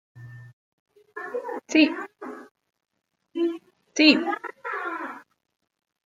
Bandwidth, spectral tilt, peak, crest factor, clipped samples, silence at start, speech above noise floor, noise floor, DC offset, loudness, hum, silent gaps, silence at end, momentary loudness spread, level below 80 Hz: 7.6 kHz; -3.5 dB/octave; -2 dBFS; 24 dB; under 0.1%; 0.15 s; 22 dB; -44 dBFS; under 0.1%; -24 LUFS; none; 0.53-0.86 s, 2.51-2.55 s; 0.85 s; 27 LU; -80 dBFS